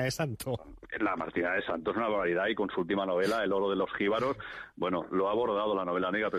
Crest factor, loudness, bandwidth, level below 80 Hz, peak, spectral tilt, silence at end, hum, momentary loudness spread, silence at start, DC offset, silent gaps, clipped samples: 12 dB; -31 LUFS; 15 kHz; -60 dBFS; -18 dBFS; -5.5 dB/octave; 0 s; none; 7 LU; 0 s; under 0.1%; none; under 0.1%